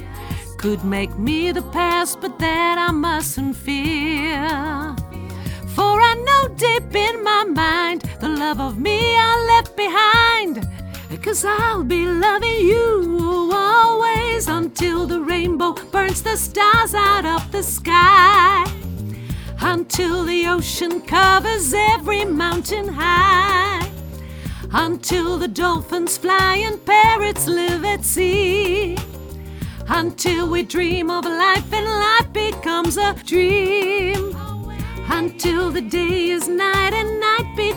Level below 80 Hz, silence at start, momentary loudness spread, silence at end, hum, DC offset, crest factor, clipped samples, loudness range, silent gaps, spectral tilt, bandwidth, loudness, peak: -34 dBFS; 0 s; 14 LU; 0 s; none; under 0.1%; 18 dB; under 0.1%; 5 LU; none; -3.5 dB/octave; over 20 kHz; -17 LUFS; 0 dBFS